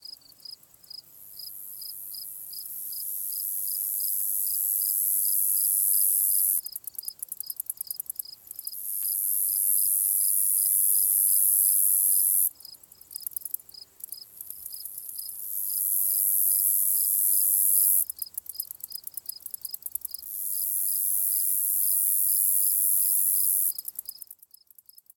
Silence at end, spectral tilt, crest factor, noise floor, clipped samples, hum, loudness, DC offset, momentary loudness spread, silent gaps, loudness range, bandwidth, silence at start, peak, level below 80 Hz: 0.85 s; 3.5 dB/octave; 20 dB; -55 dBFS; under 0.1%; none; -22 LUFS; under 0.1%; 18 LU; none; 9 LU; 19.5 kHz; 0.05 s; -8 dBFS; -78 dBFS